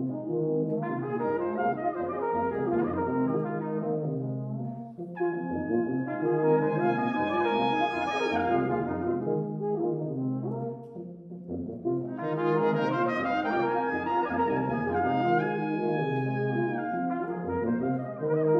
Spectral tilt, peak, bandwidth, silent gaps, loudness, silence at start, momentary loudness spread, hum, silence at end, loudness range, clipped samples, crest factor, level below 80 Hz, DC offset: -8.5 dB/octave; -14 dBFS; 6.6 kHz; none; -29 LUFS; 0 s; 7 LU; none; 0 s; 4 LU; under 0.1%; 16 dB; -64 dBFS; under 0.1%